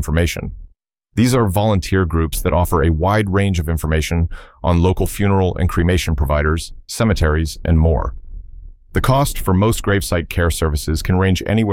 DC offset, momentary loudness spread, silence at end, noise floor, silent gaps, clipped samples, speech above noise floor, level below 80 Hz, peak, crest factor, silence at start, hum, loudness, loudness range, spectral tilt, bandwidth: under 0.1%; 6 LU; 0 s; -52 dBFS; none; under 0.1%; 36 dB; -24 dBFS; -4 dBFS; 14 dB; 0 s; none; -17 LUFS; 2 LU; -6 dB/octave; 17 kHz